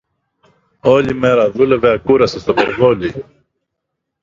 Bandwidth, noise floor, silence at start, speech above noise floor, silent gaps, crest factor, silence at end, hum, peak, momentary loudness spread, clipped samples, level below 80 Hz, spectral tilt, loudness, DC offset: 7.4 kHz; -76 dBFS; 0.85 s; 63 dB; none; 16 dB; 1 s; none; 0 dBFS; 6 LU; under 0.1%; -44 dBFS; -6.5 dB/octave; -14 LUFS; under 0.1%